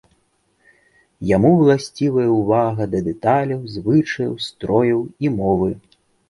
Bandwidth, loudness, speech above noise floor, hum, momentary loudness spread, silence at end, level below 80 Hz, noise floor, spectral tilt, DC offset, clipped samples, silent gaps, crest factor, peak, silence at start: 11.5 kHz; -18 LUFS; 46 dB; none; 10 LU; 0.5 s; -48 dBFS; -64 dBFS; -7.5 dB/octave; under 0.1%; under 0.1%; none; 16 dB; -2 dBFS; 1.2 s